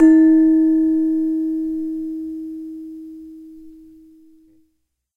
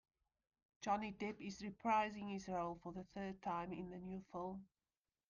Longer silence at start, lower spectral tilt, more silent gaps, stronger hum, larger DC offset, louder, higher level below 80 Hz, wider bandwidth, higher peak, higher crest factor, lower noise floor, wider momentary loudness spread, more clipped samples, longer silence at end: second, 0 s vs 0.8 s; first, -7.5 dB/octave vs -6 dB/octave; neither; neither; neither; first, -17 LUFS vs -45 LUFS; first, -54 dBFS vs -72 dBFS; second, 2.2 kHz vs 7.4 kHz; first, -2 dBFS vs -26 dBFS; about the same, 16 dB vs 20 dB; second, -70 dBFS vs under -90 dBFS; first, 24 LU vs 11 LU; neither; first, 1.45 s vs 0.65 s